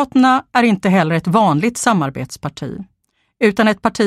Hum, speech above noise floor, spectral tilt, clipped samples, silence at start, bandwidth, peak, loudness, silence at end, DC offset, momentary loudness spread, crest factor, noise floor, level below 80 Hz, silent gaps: none; 26 dB; -5.5 dB/octave; under 0.1%; 0 s; 14.5 kHz; 0 dBFS; -15 LUFS; 0 s; under 0.1%; 13 LU; 16 dB; -41 dBFS; -52 dBFS; none